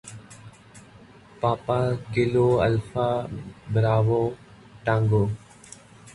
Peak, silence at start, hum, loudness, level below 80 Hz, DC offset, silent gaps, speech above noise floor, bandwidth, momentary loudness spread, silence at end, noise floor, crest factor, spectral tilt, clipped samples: -8 dBFS; 0.05 s; none; -24 LUFS; -50 dBFS; under 0.1%; none; 27 dB; 11.5 kHz; 23 LU; 0.05 s; -49 dBFS; 18 dB; -7.5 dB/octave; under 0.1%